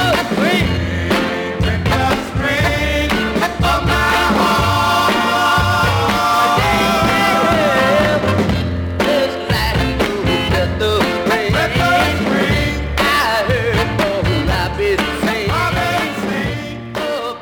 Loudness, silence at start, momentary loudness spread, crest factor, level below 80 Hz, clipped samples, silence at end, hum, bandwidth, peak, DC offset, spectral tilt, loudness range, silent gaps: -15 LUFS; 0 s; 5 LU; 12 dB; -28 dBFS; under 0.1%; 0 s; none; over 20 kHz; -2 dBFS; under 0.1%; -5 dB/octave; 3 LU; none